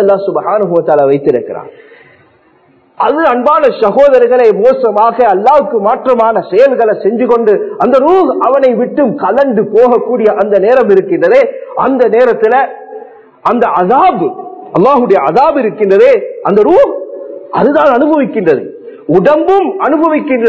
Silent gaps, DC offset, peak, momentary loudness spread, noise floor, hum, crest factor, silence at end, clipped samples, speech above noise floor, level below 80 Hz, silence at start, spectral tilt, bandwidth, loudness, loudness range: none; under 0.1%; 0 dBFS; 8 LU; -47 dBFS; none; 8 dB; 0 s; 2%; 39 dB; -50 dBFS; 0 s; -8 dB/octave; 8 kHz; -9 LUFS; 3 LU